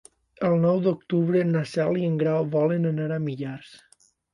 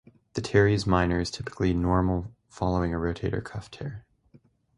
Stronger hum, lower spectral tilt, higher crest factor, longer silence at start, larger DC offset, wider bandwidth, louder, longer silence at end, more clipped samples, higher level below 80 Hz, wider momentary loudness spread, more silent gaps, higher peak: neither; first, -8.5 dB/octave vs -6.5 dB/octave; second, 14 dB vs 20 dB; about the same, 0.4 s vs 0.35 s; neither; about the same, 11 kHz vs 11 kHz; first, -24 LUFS vs -27 LUFS; second, 0.55 s vs 0.75 s; neither; second, -66 dBFS vs -40 dBFS; second, 8 LU vs 16 LU; neither; second, -10 dBFS vs -6 dBFS